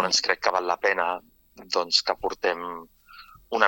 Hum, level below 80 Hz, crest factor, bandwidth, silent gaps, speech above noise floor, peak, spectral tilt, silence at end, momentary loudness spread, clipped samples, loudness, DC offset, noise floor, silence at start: none; -60 dBFS; 24 dB; 17.5 kHz; none; 24 dB; -2 dBFS; -1 dB/octave; 0 s; 12 LU; under 0.1%; -25 LUFS; under 0.1%; -50 dBFS; 0 s